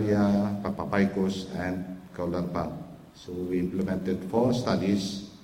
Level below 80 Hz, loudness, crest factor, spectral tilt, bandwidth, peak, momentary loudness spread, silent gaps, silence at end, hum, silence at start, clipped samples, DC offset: -54 dBFS; -28 LUFS; 16 dB; -7 dB/octave; 15.5 kHz; -10 dBFS; 11 LU; none; 0.05 s; none; 0 s; under 0.1%; under 0.1%